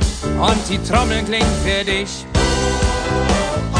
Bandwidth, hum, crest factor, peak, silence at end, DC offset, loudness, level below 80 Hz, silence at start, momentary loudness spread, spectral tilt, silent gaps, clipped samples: 10 kHz; none; 16 dB; -2 dBFS; 0 s; under 0.1%; -18 LUFS; -24 dBFS; 0 s; 3 LU; -4.5 dB/octave; none; under 0.1%